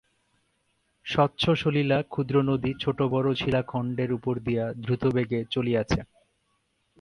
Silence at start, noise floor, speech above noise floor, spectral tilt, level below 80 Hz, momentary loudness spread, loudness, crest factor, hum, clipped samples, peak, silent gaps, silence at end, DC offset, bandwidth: 1.05 s; -72 dBFS; 47 dB; -7 dB/octave; -50 dBFS; 6 LU; -26 LUFS; 20 dB; none; under 0.1%; -8 dBFS; none; 0.95 s; under 0.1%; 10.5 kHz